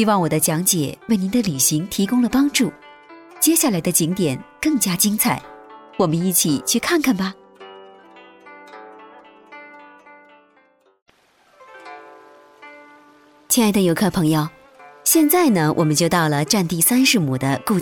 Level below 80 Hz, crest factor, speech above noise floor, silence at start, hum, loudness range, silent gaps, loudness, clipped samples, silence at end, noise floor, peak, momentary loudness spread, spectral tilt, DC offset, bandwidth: -54 dBFS; 18 dB; 40 dB; 0 s; none; 7 LU; 11.02-11.06 s; -18 LUFS; under 0.1%; 0 s; -57 dBFS; -4 dBFS; 8 LU; -4 dB/octave; under 0.1%; 19 kHz